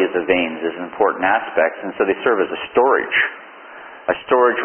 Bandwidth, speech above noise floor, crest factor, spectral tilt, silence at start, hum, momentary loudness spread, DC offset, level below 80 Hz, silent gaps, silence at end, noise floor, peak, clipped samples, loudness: 3.4 kHz; 20 dB; 18 dB; -9 dB/octave; 0 s; none; 11 LU; under 0.1%; -58 dBFS; none; 0 s; -38 dBFS; 0 dBFS; under 0.1%; -18 LUFS